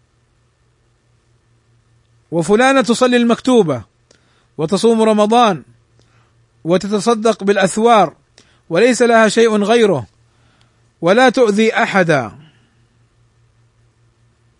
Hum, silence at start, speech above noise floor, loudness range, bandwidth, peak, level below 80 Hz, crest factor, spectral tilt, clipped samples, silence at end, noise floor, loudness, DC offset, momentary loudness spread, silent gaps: none; 2.3 s; 45 dB; 3 LU; 11 kHz; 0 dBFS; -58 dBFS; 16 dB; -5 dB/octave; under 0.1%; 2.3 s; -58 dBFS; -13 LUFS; under 0.1%; 9 LU; none